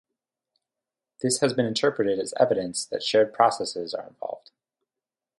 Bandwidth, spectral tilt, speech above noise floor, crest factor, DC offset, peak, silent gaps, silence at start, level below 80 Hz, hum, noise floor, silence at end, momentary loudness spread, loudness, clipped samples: 11.5 kHz; -3.5 dB/octave; 65 dB; 22 dB; under 0.1%; -6 dBFS; none; 1.2 s; -70 dBFS; none; -90 dBFS; 1 s; 13 LU; -24 LUFS; under 0.1%